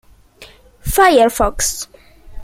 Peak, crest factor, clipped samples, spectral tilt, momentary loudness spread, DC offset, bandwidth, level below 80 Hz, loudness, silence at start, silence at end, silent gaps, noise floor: 0 dBFS; 16 dB; under 0.1%; -3 dB/octave; 18 LU; under 0.1%; 16.5 kHz; -32 dBFS; -14 LUFS; 0.4 s; 0 s; none; -43 dBFS